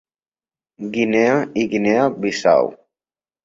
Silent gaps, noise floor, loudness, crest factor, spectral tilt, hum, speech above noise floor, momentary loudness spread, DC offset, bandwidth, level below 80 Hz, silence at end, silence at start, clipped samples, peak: none; under -90 dBFS; -18 LUFS; 18 dB; -5.5 dB/octave; none; over 73 dB; 10 LU; under 0.1%; 7.8 kHz; -60 dBFS; 0.7 s; 0.8 s; under 0.1%; -2 dBFS